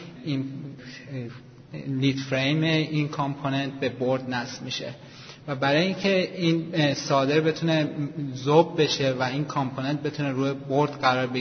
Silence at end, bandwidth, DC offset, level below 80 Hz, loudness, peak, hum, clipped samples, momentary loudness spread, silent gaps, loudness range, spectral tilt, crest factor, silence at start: 0 s; 6.6 kHz; under 0.1%; -64 dBFS; -25 LUFS; -4 dBFS; none; under 0.1%; 14 LU; none; 4 LU; -6 dB/octave; 20 dB; 0 s